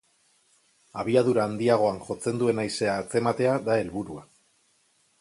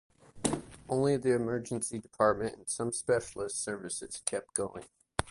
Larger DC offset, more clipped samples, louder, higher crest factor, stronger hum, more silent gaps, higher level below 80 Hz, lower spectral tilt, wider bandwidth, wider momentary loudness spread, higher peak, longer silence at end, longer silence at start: neither; neither; first, -25 LUFS vs -33 LUFS; second, 18 dB vs 28 dB; neither; neither; about the same, -62 dBFS vs -58 dBFS; first, -6 dB/octave vs -4.5 dB/octave; about the same, 11.5 kHz vs 11.5 kHz; first, 12 LU vs 9 LU; about the same, -8 dBFS vs -6 dBFS; first, 1 s vs 0 s; first, 0.95 s vs 0.35 s